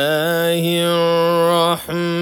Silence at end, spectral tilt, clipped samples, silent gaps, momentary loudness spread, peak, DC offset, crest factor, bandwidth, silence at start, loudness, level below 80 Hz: 0 s; -5 dB/octave; under 0.1%; none; 4 LU; -4 dBFS; under 0.1%; 14 dB; 18.5 kHz; 0 s; -16 LUFS; -58 dBFS